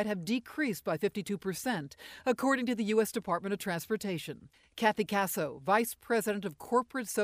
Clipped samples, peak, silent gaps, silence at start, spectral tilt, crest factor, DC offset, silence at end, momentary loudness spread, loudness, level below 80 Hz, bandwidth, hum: under 0.1%; -14 dBFS; none; 0 s; -4.5 dB/octave; 20 dB; under 0.1%; 0 s; 8 LU; -32 LUFS; -70 dBFS; 15.5 kHz; none